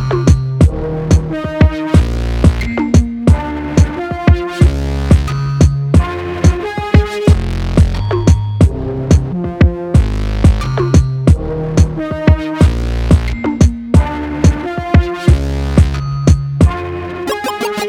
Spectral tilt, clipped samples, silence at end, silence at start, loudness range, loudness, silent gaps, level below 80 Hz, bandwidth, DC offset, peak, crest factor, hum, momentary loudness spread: -7 dB/octave; under 0.1%; 0 s; 0 s; 1 LU; -14 LUFS; none; -16 dBFS; 12 kHz; under 0.1%; 0 dBFS; 12 dB; none; 6 LU